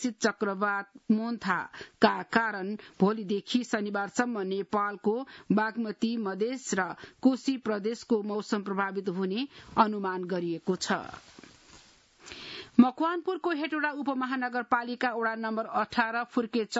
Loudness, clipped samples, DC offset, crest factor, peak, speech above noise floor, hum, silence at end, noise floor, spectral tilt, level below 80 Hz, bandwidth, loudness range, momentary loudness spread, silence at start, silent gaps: -30 LUFS; under 0.1%; under 0.1%; 24 dB; -6 dBFS; 28 dB; none; 0 s; -58 dBFS; -5 dB/octave; -70 dBFS; 8 kHz; 2 LU; 6 LU; 0 s; none